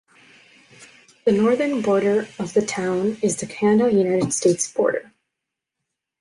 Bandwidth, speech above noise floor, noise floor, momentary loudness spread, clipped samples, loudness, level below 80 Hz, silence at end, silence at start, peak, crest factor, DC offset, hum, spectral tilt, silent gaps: 11.5 kHz; 63 dB; -83 dBFS; 6 LU; under 0.1%; -20 LUFS; -62 dBFS; 1.2 s; 0.8 s; -6 dBFS; 16 dB; under 0.1%; none; -5 dB/octave; none